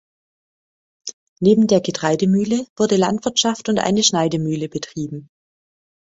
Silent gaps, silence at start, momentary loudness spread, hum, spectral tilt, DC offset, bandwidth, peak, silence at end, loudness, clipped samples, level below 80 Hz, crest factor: 1.13-1.36 s, 2.70-2.76 s; 1.05 s; 17 LU; none; -4.5 dB/octave; under 0.1%; 8 kHz; -2 dBFS; 0.9 s; -18 LUFS; under 0.1%; -56 dBFS; 18 dB